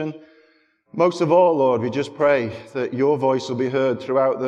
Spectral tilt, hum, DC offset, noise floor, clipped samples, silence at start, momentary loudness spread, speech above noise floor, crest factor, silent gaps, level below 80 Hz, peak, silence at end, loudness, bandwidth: -6.5 dB/octave; none; under 0.1%; -60 dBFS; under 0.1%; 0 s; 11 LU; 40 dB; 16 dB; none; -66 dBFS; -4 dBFS; 0 s; -20 LUFS; 9.2 kHz